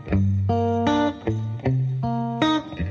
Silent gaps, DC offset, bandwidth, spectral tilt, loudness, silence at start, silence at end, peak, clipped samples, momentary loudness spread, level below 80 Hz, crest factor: none; under 0.1%; 7.2 kHz; -7.5 dB/octave; -23 LUFS; 0 s; 0 s; -6 dBFS; under 0.1%; 5 LU; -38 dBFS; 16 dB